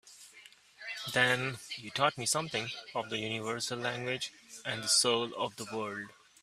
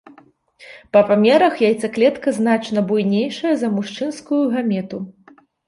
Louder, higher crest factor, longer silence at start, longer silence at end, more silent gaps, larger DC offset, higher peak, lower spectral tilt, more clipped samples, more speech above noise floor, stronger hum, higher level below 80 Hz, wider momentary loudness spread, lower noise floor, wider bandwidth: second, -32 LUFS vs -18 LUFS; first, 24 dB vs 16 dB; second, 0.05 s vs 0.6 s; second, 0.3 s vs 0.55 s; neither; neither; second, -10 dBFS vs -2 dBFS; second, -2 dB/octave vs -6 dB/octave; neither; second, 24 dB vs 33 dB; neither; second, -74 dBFS vs -64 dBFS; first, 15 LU vs 11 LU; first, -58 dBFS vs -51 dBFS; first, 15.5 kHz vs 11.5 kHz